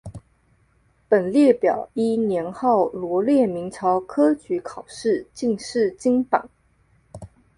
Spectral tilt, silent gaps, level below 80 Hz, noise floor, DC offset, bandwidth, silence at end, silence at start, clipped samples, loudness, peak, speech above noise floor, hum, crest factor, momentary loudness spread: -6.5 dB/octave; none; -58 dBFS; -61 dBFS; under 0.1%; 11 kHz; 0.3 s; 0.05 s; under 0.1%; -21 LUFS; -2 dBFS; 41 dB; none; 20 dB; 9 LU